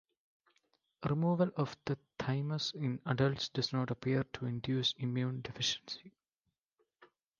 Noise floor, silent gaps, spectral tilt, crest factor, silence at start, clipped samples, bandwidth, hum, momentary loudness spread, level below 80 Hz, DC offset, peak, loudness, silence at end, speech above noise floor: -87 dBFS; 6.34-6.44 s; -5.5 dB/octave; 22 dB; 1 s; under 0.1%; 7.4 kHz; none; 8 LU; -68 dBFS; under 0.1%; -16 dBFS; -36 LUFS; 0.35 s; 52 dB